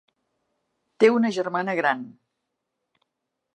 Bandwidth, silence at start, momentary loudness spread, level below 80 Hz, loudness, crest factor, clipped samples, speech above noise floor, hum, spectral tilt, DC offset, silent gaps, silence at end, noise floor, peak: 9.2 kHz; 1 s; 11 LU; -84 dBFS; -22 LUFS; 22 dB; under 0.1%; 59 dB; none; -5.5 dB/octave; under 0.1%; none; 1.45 s; -81 dBFS; -4 dBFS